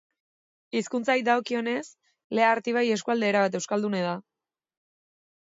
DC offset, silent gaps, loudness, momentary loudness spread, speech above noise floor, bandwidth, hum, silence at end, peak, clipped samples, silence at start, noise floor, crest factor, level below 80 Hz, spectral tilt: under 0.1%; 2.24-2.30 s; -26 LUFS; 9 LU; over 65 dB; 7.8 kHz; none; 1.25 s; -8 dBFS; under 0.1%; 0.75 s; under -90 dBFS; 18 dB; -78 dBFS; -4.5 dB/octave